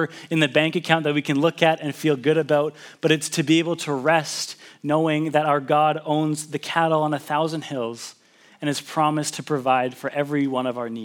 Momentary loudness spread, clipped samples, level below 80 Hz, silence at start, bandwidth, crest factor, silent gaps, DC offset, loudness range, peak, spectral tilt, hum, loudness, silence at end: 8 LU; under 0.1%; -78 dBFS; 0 s; 17 kHz; 22 dB; none; under 0.1%; 4 LU; 0 dBFS; -5 dB/octave; none; -22 LUFS; 0 s